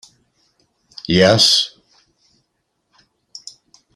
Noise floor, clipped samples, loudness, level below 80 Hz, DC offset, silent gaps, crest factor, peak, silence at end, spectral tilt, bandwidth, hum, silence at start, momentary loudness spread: -71 dBFS; under 0.1%; -13 LUFS; -54 dBFS; under 0.1%; none; 20 dB; -2 dBFS; 2.3 s; -3.5 dB/octave; 15 kHz; none; 1.1 s; 26 LU